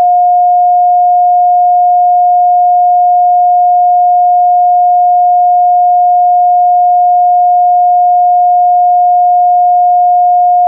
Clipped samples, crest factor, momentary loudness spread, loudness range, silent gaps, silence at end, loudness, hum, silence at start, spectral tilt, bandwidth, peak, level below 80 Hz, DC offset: under 0.1%; 4 dB; 0 LU; 0 LU; none; 0 s; -7 LUFS; none; 0 s; -8.5 dB/octave; 0.8 kHz; -4 dBFS; under -90 dBFS; under 0.1%